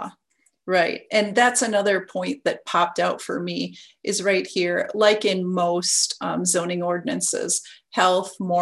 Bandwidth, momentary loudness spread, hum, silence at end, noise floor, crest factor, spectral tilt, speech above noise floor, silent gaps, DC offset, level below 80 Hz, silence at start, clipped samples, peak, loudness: 13.5 kHz; 10 LU; none; 0 s; -67 dBFS; 18 dB; -3 dB/octave; 45 dB; none; under 0.1%; -70 dBFS; 0 s; under 0.1%; -4 dBFS; -22 LUFS